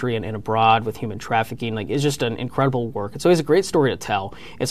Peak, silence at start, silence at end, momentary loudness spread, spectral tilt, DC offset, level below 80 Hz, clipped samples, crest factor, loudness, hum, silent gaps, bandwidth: -4 dBFS; 0 s; 0 s; 10 LU; -5.5 dB/octave; 0.9%; -50 dBFS; under 0.1%; 16 dB; -21 LUFS; none; none; 14 kHz